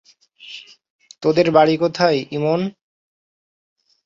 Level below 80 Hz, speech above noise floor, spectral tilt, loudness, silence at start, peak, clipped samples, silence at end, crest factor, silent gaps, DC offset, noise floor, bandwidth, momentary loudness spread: -62 dBFS; 27 dB; -6.5 dB/octave; -18 LUFS; 0.45 s; -2 dBFS; under 0.1%; 1.35 s; 20 dB; 0.90-0.99 s; under 0.1%; -43 dBFS; 7.6 kHz; 22 LU